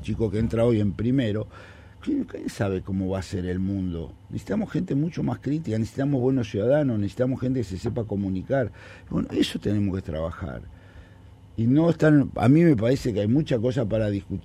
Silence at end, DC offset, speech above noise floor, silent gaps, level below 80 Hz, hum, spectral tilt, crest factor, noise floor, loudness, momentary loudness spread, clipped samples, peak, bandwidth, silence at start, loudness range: 0.05 s; under 0.1%; 24 dB; none; -46 dBFS; none; -8 dB/octave; 18 dB; -48 dBFS; -25 LUFS; 12 LU; under 0.1%; -6 dBFS; 13 kHz; 0 s; 7 LU